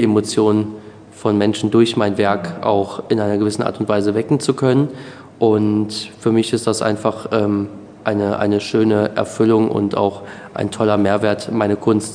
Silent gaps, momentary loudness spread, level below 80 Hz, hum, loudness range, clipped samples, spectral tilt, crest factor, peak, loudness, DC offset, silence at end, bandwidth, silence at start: none; 8 LU; -58 dBFS; none; 1 LU; under 0.1%; -6 dB/octave; 16 dB; 0 dBFS; -17 LUFS; under 0.1%; 0 s; 10 kHz; 0 s